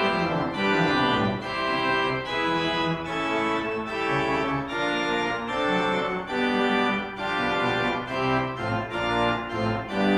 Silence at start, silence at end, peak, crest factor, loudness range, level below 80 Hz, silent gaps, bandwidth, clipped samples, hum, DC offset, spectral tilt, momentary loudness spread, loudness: 0 s; 0 s; -10 dBFS; 14 dB; 1 LU; -50 dBFS; none; 12 kHz; under 0.1%; none; under 0.1%; -5.5 dB/octave; 5 LU; -25 LUFS